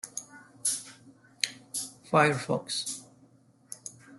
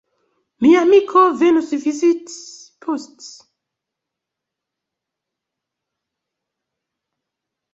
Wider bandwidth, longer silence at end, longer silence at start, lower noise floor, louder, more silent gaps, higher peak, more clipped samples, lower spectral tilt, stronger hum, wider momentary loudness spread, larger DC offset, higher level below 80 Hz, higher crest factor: first, 12.5 kHz vs 8 kHz; second, 0 s vs 4.45 s; second, 0.05 s vs 0.6 s; second, -61 dBFS vs -83 dBFS; second, -30 LUFS vs -15 LUFS; neither; about the same, -4 dBFS vs -2 dBFS; neither; second, -3 dB/octave vs -4.5 dB/octave; neither; about the same, 19 LU vs 20 LU; neither; second, -72 dBFS vs -66 dBFS; first, 28 dB vs 18 dB